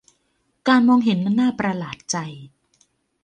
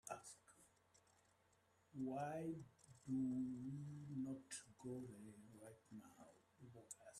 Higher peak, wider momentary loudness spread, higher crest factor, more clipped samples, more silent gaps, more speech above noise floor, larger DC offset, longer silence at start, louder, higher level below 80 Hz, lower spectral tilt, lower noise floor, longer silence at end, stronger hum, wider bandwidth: first, -4 dBFS vs -36 dBFS; second, 12 LU vs 19 LU; about the same, 18 dB vs 16 dB; neither; neither; first, 49 dB vs 30 dB; neither; first, 0.65 s vs 0.05 s; first, -20 LUFS vs -51 LUFS; first, -62 dBFS vs -84 dBFS; about the same, -5 dB/octave vs -6 dB/octave; second, -68 dBFS vs -78 dBFS; first, 0.75 s vs 0 s; neither; second, 9.4 kHz vs 13 kHz